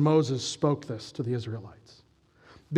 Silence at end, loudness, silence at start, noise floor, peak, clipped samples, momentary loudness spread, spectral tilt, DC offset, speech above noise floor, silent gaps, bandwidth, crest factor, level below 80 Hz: 0 s; -30 LUFS; 0 s; -59 dBFS; -8 dBFS; under 0.1%; 15 LU; -6.5 dB/octave; under 0.1%; 31 dB; none; 10.5 kHz; 20 dB; -68 dBFS